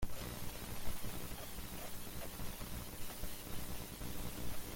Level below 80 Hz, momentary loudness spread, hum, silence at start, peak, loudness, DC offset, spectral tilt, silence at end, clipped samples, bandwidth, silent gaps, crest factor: -50 dBFS; 1 LU; none; 0 s; -24 dBFS; -47 LUFS; under 0.1%; -4 dB/octave; 0 s; under 0.1%; 17 kHz; none; 16 dB